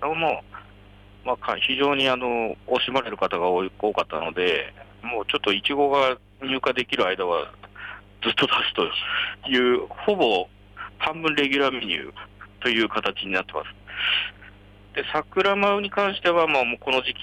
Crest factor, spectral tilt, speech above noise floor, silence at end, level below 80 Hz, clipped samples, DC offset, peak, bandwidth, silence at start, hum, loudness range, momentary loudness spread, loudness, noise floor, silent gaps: 16 dB; -4.5 dB/octave; 25 dB; 0 s; -54 dBFS; under 0.1%; under 0.1%; -10 dBFS; 11 kHz; 0 s; 50 Hz at -50 dBFS; 2 LU; 13 LU; -23 LUFS; -48 dBFS; none